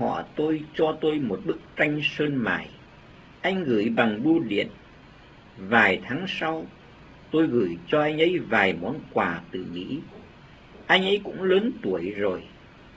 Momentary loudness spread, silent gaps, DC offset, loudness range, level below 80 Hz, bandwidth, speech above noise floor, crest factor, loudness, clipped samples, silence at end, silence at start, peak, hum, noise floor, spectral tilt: 12 LU; none; under 0.1%; 2 LU; -56 dBFS; 8 kHz; 25 dB; 22 dB; -25 LUFS; under 0.1%; 0.05 s; 0 s; -4 dBFS; none; -49 dBFS; -6.5 dB/octave